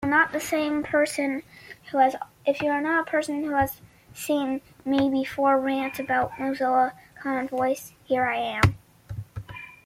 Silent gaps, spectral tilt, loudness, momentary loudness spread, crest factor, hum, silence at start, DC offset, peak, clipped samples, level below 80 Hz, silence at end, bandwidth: none; -5.5 dB/octave; -25 LUFS; 15 LU; 20 dB; none; 0 s; under 0.1%; -6 dBFS; under 0.1%; -50 dBFS; 0.1 s; 16 kHz